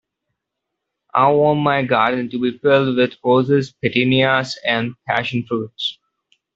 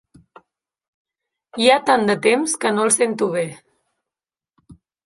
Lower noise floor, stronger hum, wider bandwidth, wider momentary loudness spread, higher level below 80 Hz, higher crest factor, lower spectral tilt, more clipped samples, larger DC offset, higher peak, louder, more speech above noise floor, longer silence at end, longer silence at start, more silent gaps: second, -79 dBFS vs -90 dBFS; neither; second, 7.8 kHz vs 11.5 kHz; about the same, 8 LU vs 9 LU; about the same, -60 dBFS vs -64 dBFS; about the same, 16 dB vs 20 dB; first, -6.5 dB/octave vs -3 dB/octave; neither; neither; about the same, -2 dBFS vs -2 dBFS; about the same, -18 LUFS vs -18 LUFS; second, 62 dB vs 72 dB; first, 0.65 s vs 0.35 s; second, 1.15 s vs 1.55 s; neither